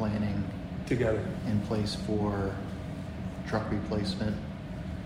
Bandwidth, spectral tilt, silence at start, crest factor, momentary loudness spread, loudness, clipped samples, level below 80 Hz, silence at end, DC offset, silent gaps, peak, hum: 14.5 kHz; -7 dB/octave; 0 s; 16 dB; 9 LU; -33 LUFS; under 0.1%; -46 dBFS; 0 s; under 0.1%; none; -16 dBFS; none